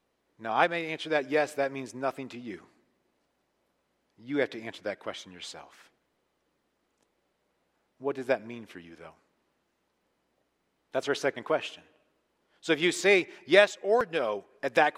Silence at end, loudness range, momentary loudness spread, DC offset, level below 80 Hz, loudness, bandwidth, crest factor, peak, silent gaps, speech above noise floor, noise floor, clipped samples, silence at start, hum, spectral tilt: 0.05 s; 12 LU; 19 LU; under 0.1%; -78 dBFS; -28 LUFS; 15 kHz; 26 dB; -4 dBFS; none; 47 dB; -76 dBFS; under 0.1%; 0.4 s; none; -3.5 dB/octave